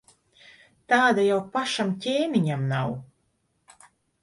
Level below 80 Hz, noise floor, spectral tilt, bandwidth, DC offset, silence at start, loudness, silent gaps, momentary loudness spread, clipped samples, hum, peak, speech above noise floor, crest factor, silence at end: -66 dBFS; -71 dBFS; -5.5 dB/octave; 11.5 kHz; under 0.1%; 0.9 s; -24 LUFS; none; 8 LU; under 0.1%; none; -8 dBFS; 48 dB; 18 dB; 1.2 s